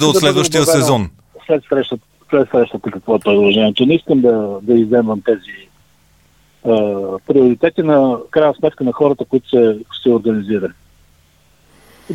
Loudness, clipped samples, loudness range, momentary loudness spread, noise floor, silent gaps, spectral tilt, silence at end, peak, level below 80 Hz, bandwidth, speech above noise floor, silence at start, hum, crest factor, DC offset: -14 LUFS; under 0.1%; 3 LU; 8 LU; -53 dBFS; none; -5 dB/octave; 0 s; 0 dBFS; -50 dBFS; 17 kHz; 39 dB; 0 s; none; 14 dB; 0.1%